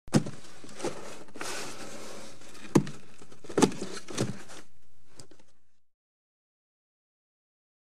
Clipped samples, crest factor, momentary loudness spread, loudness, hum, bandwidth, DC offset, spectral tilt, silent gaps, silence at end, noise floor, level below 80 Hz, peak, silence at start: under 0.1%; 28 dB; 23 LU; -32 LUFS; none; 15 kHz; 2%; -5 dB/octave; none; 1.95 s; -59 dBFS; -62 dBFS; -6 dBFS; 0.05 s